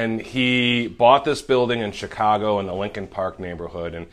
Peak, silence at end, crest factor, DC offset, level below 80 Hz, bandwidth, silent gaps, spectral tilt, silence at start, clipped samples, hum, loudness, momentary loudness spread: -2 dBFS; 0.05 s; 20 dB; under 0.1%; -48 dBFS; 12.5 kHz; none; -5.5 dB/octave; 0 s; under 0.1%; none; -21 LUFS; 14 LU